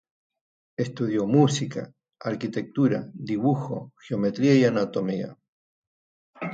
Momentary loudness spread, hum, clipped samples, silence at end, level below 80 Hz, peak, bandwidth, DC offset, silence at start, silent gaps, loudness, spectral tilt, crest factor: 16 LU; none; under 0.1%; 0 s; -68 dBFS; -6 dBFS; 9.2 kHz; under 0.1%; 0.8 s; 5.48-6.33 s; -25 LUFS; -6.5 dB/octave; 20 dB